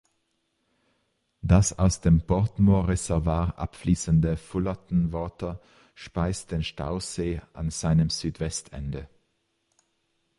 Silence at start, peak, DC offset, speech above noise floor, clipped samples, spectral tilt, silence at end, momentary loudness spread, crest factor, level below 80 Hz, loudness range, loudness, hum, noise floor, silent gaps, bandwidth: 1.45 s; -8 dBFS; under 0.1%; 49 dB; under 0.1%; -6 dB/octave; 1.3 s; 14 LU; 18 dB; -36 dBFS; 6 LU; -26 LUFS; none; -74 dBFS; none; 11.5 kHz